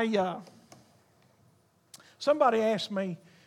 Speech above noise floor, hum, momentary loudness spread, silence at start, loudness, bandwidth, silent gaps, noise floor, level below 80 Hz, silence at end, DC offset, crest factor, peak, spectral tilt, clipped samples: 38 dB; none; 12 LU; 0 s; -28 LUFS; 13.5 kHz; none; -65 dBFS; -84 dBFS; 0.3 s; under 0.1%; 20 dB; -12 dBFS; -5.5 dB/octave; under 0.1%